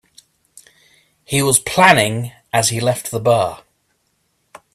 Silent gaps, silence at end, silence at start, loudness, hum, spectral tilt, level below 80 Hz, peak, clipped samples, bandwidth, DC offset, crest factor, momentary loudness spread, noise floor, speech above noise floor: none; 1.15 s; 1.3 s; -15 LUFS; none; -3.5 dB/octave; -54 dBFS; 0 dBFS; under 0.1%; 16 kHz; under 0.1%; 18 dB; 10 LU; -66 dBFS; 50 dB